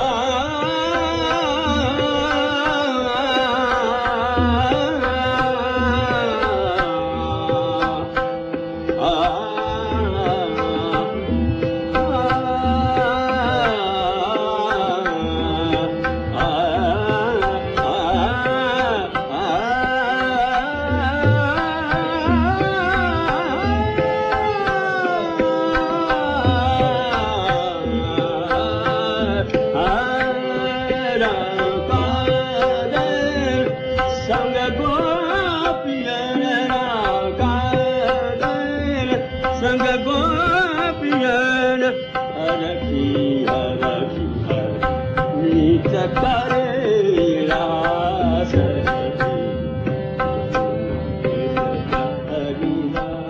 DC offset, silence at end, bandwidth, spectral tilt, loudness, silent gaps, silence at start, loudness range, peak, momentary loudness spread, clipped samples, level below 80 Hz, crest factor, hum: under 0.1%; 0 s; 7.8 kHz; -6.5 dB/octave; -20 LUFS; none; 0 s; 2 LU; -4 dBFS; 5 LU; under 0.1%; -36 dBFS; 16 dB; none